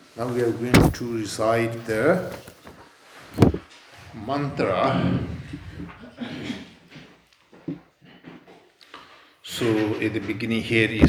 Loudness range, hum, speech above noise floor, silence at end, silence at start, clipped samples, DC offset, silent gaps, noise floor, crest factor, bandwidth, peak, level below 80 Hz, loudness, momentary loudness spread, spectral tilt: 15 LU; none; 32 dB; 0 s; 0.15 s; under 0.1%; under 0.1%; none; -54 dBFS; 24 dB; over 20 kHz; 0 dBFS; -42 dBFS; -24 LUFS; 22 LU; -6 dB/octave